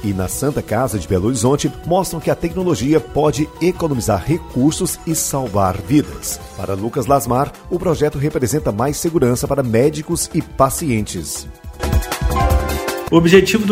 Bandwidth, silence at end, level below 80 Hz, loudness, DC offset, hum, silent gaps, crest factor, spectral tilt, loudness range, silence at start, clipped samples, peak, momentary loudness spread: 16 kHz; 0 s; -30 dBFS; -17 LUFS; under 0.1%; none; none; 16 dB; -5.5 dB/octave; 1 LU; 0 s; under 0.1%; 0 dBFS; 6 LU